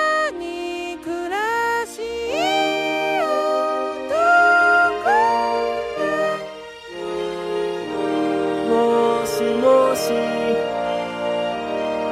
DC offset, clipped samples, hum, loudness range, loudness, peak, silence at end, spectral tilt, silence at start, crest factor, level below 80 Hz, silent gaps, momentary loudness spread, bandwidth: under 0.1%; under 0.1%; none; 5 LU; -20 LUFS; -4 dBFS; 0 s; -4 dB/octave; 0 s; 16 dB; -54 dBFS; none; 12 LU; 15 kHz